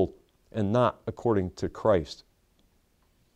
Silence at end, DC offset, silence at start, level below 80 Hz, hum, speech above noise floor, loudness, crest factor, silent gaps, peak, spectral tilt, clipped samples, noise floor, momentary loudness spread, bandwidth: 1.2 s; under 0.1%; 0 s; -54 dBFS; none; 40 dB; -28 LUFS; 20 dB; none; -10 dBFS; -7.5 dB/octave; under 0.1%; -67 dBFS; 13 LU; 9.8 kHz